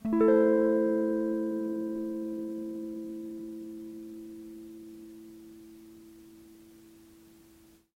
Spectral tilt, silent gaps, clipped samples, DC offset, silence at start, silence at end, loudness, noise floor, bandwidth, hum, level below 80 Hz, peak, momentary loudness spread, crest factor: -8 dB/octave; none; under 0.1%; under 0.1%; 0.05 s; 1.1 s; -30 LUFS; -59 dBFS; 16 kHz; none; -68 dBFS; -14 dBFS; 26 LU; 18 dB